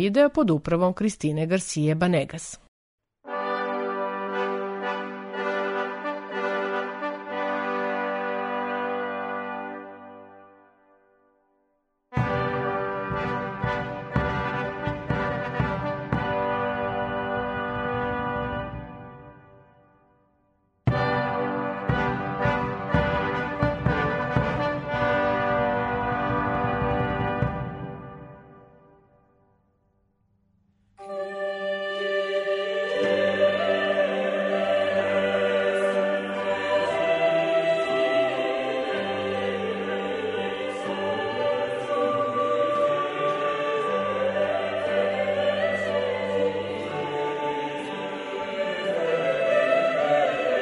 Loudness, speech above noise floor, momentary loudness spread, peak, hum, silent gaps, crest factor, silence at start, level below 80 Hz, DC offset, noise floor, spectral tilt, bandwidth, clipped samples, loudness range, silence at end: -26 LUFS; 49 dB; 8 LU; -6 dBFS; none; 2.68-2.98 s; 20 dB; 0 s; -48 dBFS; under 0.1%; -72 dBFS; -6 dB/octave; 10.5 kHz; under 0.1%; 8 LU; 0 s